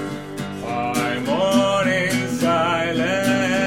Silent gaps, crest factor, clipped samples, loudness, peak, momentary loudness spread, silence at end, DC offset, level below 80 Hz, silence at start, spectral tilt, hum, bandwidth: none; 14 dB; under 0.1%; -20 LUFS; -6 dBFS; 11 LU; 0 s; 0.3%; -56 dBFS; 0 s; -4.5 dB/octave; none; 17 kHz